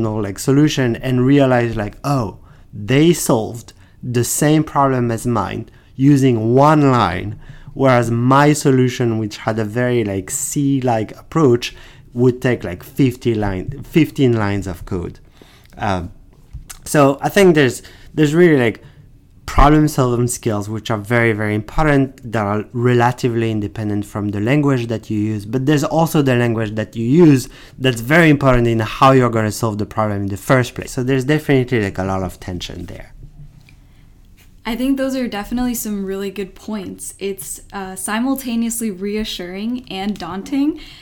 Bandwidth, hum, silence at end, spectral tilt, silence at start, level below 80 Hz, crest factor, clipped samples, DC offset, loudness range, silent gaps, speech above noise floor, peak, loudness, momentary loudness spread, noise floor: 18.5 kHz; none; 0.05 s; -6 dB/octave; 0 s; -34 dBFS; 14 dB; under 0.1%; under 0.1%; 8 LU; none; 28 dB; -2 dBFS; -17 LUFS; 15 LU; -44 dBFS